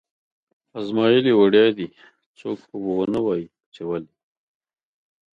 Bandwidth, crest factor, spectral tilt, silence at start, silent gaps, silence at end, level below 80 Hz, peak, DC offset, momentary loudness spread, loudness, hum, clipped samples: 5.4 kHz; 18 dB; -7.5 dB/octave; 0.75 s; 2.26-2.34 s, 3.66-3.72 s; 1.35 s; -64 dBFS; -4 dBFS; under 0.1%; 19 LU; -20 LUFS; none; under 0.1%